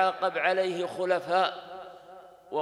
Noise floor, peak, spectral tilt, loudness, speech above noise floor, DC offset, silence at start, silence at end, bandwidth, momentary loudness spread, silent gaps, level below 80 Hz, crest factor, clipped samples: -50 dBFS; -10 dBFS; -4.5 dB/octave; -28 LUFS; 23 dB; under 0.1%; 0 s; 0 s; 12 kHz; 18 LU; none; -78 dBFS; 18 dB; under 0.1%